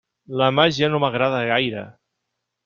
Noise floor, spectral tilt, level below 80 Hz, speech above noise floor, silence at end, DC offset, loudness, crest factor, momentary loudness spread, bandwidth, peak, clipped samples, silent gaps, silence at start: -79 dBFS; -5.5 dB/octave; -60 dBFS; 59 dB; 0.75 s; under 0.1%; -19 LUFS; 18 dB; 11 LU; 7.4 kHz; -4 dBFS; under 0.1%; none; 0.3 s